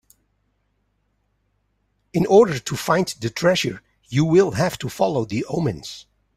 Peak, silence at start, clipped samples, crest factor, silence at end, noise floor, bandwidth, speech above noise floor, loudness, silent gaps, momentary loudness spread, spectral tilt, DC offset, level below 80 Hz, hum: -2 dBFS; 2.15 s; under 0.1%; 20 dB; 0.35 s; -69 dBFS; 15 kHz; 49 dB; -20 LUFS; none; 12 LU; -5.5 dB/octave; under 0.1%; -54 dBFS; 50 Hz at -45 dBFS